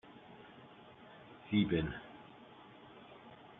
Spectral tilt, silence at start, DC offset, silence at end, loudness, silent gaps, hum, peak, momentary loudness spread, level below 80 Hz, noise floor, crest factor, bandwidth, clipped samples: -5.5 dB/octave; 0.05 s; under 0.1%; 0.05 s; -36 LUFS; none; none; -20 dBFS; 23 LU; -62 dBFS; -57 dBFS; 22 dB; 4 kHz; under 0.1%